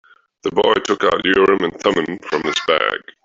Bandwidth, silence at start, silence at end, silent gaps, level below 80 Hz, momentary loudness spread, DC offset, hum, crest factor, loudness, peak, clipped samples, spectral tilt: 7.8 kHz; 0.45 s; 0.25 s; none; -52 dBFS; 8 LU; under 0.1%; none; 16 dB; -17 LUFS; -2 dBFS; under 0.1%; -4 dB/octave